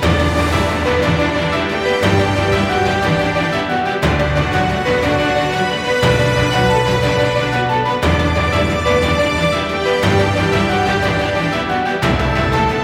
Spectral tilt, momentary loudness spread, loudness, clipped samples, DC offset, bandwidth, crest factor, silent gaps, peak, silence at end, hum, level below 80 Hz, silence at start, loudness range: -5.5 dB/octave; 3 LU; -15 LUFS; under 0.1%; under 0.1%; 16.5 kHz; 14 dB; none; -2 dBFS; 0 s; none; -28 dBFS; 0 s; 1 LU